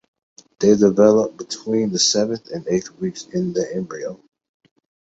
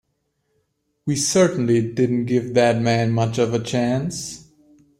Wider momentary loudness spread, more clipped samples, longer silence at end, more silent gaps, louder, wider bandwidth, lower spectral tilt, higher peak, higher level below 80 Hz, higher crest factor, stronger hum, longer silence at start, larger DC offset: first, 14 LU vs 11 LU; neither; first, 0.95 s vs 0.6 s; neither; about the same, -19 LUFS vs -20 LUFS; second, 8.2 kHz vs 15.5 kHz; about the same, -4.5 dB/octave vs -5.5 dB/octave; about the same, -2 dBFS vs -4 dBFS; about the same, -58 dBFS vs -56 dBFS; about the same, 18 dB vs 16 dB; neither; second, 0.6 s vs 1.05 s; neither